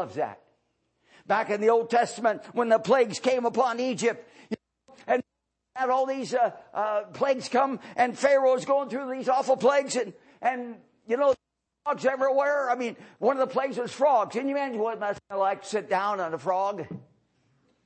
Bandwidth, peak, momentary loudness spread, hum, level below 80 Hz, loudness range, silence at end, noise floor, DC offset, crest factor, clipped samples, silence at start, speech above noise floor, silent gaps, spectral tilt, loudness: 8.8 kHz; -8 dBFS; 11 LU; none; -76 dBFS; 4 LU; 0.85 s; -82 dBFS; under 0.1%; 18 dB; under 0.1%; 0 s; 56 dB; none; -4 dB/octave; -26 LUFS